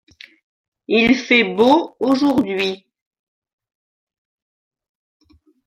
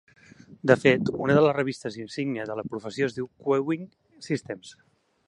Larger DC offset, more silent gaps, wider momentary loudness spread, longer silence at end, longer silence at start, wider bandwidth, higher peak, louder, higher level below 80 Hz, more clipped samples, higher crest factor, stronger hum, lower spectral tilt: neither; neither; second, 8 LU vs 14 LU; first, 2.9 s vs 0.55 s; first, 0.9 s vs 0.5 s; about the same, 11 kHz vs 11 kHz; about the same, -2 dBFS vs -2 dBFS; first, -16 LUFS vs -26 LUFS; first, -56 dBFS vs -62 dBFS; neither; second, 18 dB vs 24 dB; neither; second, -5 dB/octave vs -6.5 dB/octave